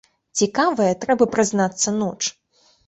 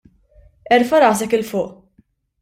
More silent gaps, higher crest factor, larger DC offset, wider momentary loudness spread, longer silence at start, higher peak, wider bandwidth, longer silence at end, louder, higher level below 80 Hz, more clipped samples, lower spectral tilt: neither; about the same, 18 dB vs 18 dB; neither; second, 8 LU vs 11 LU; second, 0.35 s vs 0.7 s; about the same, -4 dBFS vs -2 dBFS; second, 8.4 kHz vs 16 kHz; second, 0.55 s vs 0.7 s; second, -20 LUFS vs -16 LUFS; second, -60 dBFS vs -54 dBFS; neither; about the same, -3.5 dB/octave vs -4 dB/octave